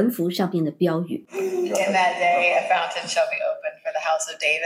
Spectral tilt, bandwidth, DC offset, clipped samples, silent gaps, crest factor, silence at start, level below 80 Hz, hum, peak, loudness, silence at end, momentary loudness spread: -4 dB/octave; 16.5 kHz; under 0.1%; under 0.1%; none; 16 dB; 0 s; -84 dBFS; none; -6 dBFS; -22 LUFS; 0 s; 8 LU